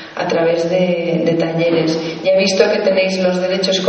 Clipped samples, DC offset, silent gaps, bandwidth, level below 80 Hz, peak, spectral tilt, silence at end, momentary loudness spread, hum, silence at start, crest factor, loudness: under 0.1%; under 0.1%; none; 8.6 kHz; -58 dBFS; 0 dBFS; -5 dB/octave; 0 s; 3 LU; none; 0 s; 14 dB; -15 LUFS